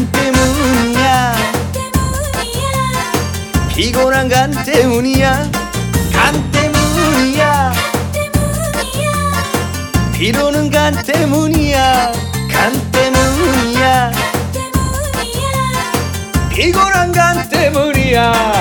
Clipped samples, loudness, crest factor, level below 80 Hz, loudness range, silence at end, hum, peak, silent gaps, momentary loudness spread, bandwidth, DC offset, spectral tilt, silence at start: under 0.1%; -13 LUFS; 14 dB; -26 dBFS; 2 LU; 0 s; none; 0 dBFS; none; 6 LU; 19.5 kHz; under 0.1%; -4.5 dB/octave; 0 s